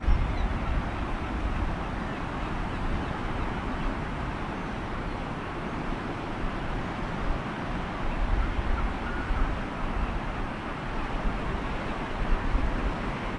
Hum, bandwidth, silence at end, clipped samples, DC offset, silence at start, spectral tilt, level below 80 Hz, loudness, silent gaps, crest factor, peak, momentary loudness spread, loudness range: none; 10 kHz; 0 s; under 0.1%; under 0.1%; 0 s; -7 dB/octave; -32 dBFS; -32 LUFS; none; 18 dB; -12 dBFS; 4 LU; 2 LU